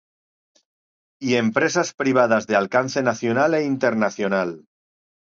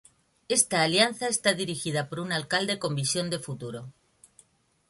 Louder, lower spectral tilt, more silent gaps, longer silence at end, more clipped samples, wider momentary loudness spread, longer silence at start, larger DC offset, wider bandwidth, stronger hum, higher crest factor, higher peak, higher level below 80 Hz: first, -21 LUFS vs -26 LUFS; first, -5 dB/octave vs -3 dB/octave; first, 1.94-1.98 s vs none; second, 0.8 s vs 1 s; neither; second, 5 LU vs 13 LU; first, 1.2 s vs 0.5 s; neither; second, 7.8 kHz vs 12 kHz; neither; about the same, 18 dB vs 22 dB; first, -4 dBFS vs -8 dBFS; about the same, -68 dBFS vs -66 dBFS